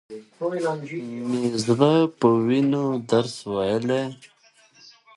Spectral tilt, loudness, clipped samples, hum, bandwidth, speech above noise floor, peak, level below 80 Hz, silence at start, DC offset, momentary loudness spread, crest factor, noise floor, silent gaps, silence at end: -6.5 dB/octave; -23 LUFS; under 0.1%; none; 11.5 kHz; 34 dB; -4 dBFS; -64 dBFS; 0.1 s; under 0.1%; 12 LU; 20 dB; -56 dBFS; none; 0.9 s